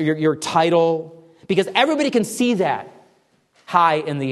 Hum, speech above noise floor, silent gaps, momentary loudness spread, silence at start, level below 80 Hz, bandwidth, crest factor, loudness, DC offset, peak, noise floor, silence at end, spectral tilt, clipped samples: none; 41 dB; none; 6 LU; 0 s; -68 dBFS; 13 kHz; 18 dB; -19 LUFS; under 0.1%; 0 dBFS; -60 dBFS; 0 s; -5 dB/octave; under 0.1%